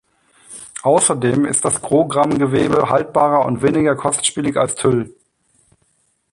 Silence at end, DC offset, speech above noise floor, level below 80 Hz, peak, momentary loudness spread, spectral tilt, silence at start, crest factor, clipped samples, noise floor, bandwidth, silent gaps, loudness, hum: 1.2 s; under 0.1%; 47 dB; -50 dBFS; -2 dBFS; 7 LU; -4.5 dB/octave; 0.5 s; 14 dB; under 0.1%; -63 dBFS; 11.5 kHz; none; -16 LUFS; none